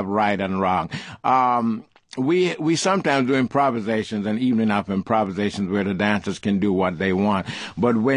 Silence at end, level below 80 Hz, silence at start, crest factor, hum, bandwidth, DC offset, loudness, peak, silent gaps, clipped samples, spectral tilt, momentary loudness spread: 0 s; -50 dBFS; 0 s; 18 dB; none; 10.5 kHz; under 0.1%; -21 LUFS; -4 dBFS; none; under 0.1%; -6 dB/octave; 6 LU